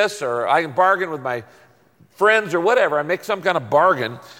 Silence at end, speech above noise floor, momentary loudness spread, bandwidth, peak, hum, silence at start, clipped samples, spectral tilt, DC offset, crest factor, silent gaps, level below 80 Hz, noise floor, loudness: 0.05 s; 35 dB; 8 LU; 17 kHz; -4 dBFS; none; 0 s; under 0.1%; -4.5 dB/octave; under 0.1%; 16 dB; none; -68 dBFS; -54 dBFS; -18 LUFS